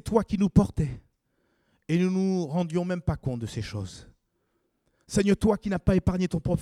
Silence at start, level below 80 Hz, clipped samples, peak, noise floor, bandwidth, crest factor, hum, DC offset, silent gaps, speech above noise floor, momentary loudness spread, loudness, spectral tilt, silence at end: 0.05 s; -44 dBFS; under 0.1%; -6 dBFS; -74 dBFS; 12 kHz; 22 dB; none; under 0.1%; none; 49 dB; 11 LU; -27 LUFS; -7.5 dB/octave; 0 s